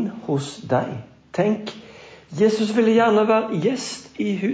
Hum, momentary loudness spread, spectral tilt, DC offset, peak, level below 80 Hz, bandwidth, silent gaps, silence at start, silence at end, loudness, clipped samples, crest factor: none; 15 LU; -6 dB/octave; under 0.1%; -6 dBFS; -62 dBFS; 8 kHz; none; 0 s; 0 s; -21 LUFS; under 0.1%; 14 dB